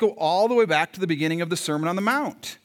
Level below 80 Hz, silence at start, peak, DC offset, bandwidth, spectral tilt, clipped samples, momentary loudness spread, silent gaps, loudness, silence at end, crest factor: -78 dBFS; 0 s; -6 dBFS; under 0.1%; 18 kHz; -4.5 dB/octave; under 0.1%; 6 LU; none; -23 LUFS; 0.1 s; 16 dB